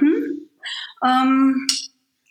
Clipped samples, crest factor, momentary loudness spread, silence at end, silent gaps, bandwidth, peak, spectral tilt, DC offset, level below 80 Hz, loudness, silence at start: under 0.1%; 18 dB; 14 LU; 0.45 s; none; 12.5 kHz; -2 dBFS; -1.5 dB/octave; under 0.1%; -80 dBFS; -20 LUFS; 0 s